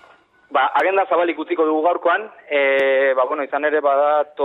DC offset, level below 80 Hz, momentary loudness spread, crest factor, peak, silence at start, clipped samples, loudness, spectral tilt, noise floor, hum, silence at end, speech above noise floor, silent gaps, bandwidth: under 0.1%; -74 dBFS; 5 LU; 14 dB; -6 dBFS; 0.5 s; under 0.1%; -18 LUFS; -5 dB/octave; -51 dBFS; none; 0 s; 33 dB; none; 4.8 kHz